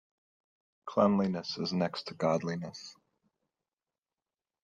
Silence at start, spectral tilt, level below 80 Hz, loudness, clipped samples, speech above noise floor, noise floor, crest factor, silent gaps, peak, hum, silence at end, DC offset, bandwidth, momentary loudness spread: 0.85 s; -6.5 dB/octave; -74 dBFS; -32 LUFS; under 0.1%; over 59 dB; under -90 dBFS; 20 dB; none; -14 dBFS; none; 1.7 s; under 0.1%; 7.8 kHz; 19 LU